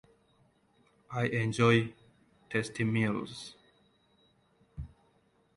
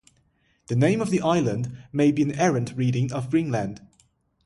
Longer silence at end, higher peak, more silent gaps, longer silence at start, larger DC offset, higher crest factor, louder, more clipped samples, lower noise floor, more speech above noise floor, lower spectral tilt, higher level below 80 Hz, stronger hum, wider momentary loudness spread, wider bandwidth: about the same, 0.7 s vs 0.65 s; about the same, -10 dBFS vs -8 dBFS; neither; first, 1.1 s vs 0.7 s; neither; first, 24 dB vs 16 dB; second, -31 LUFS vs -24 LUFS; neither; about the same, -69 dBFS vs -66 dBFS; about the same, 40 dB vs 43 dB; about the same, -6 dB/octave vs -7 dB/octave; about the same, -60 dBFS vs -58 dBFS; neither; first, 22 LU vs 8 LU; about the same, 11.5 kHz vs 11.5 kHz